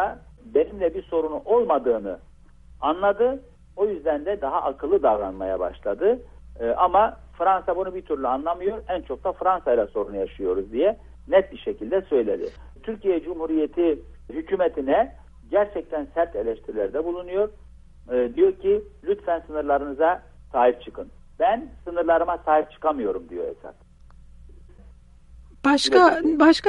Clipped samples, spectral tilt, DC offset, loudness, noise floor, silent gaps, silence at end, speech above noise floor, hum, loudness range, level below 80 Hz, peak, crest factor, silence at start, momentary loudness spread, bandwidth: under 0.1%; -5 dB/octave; under 0.1%; -23 LUFS; -48 dBFS; none; 0 s; 26 dB; none; 3 LU; -48 dBFS; -2 dBFS; 20 dB; 0 s; 11 LU; 11 kHz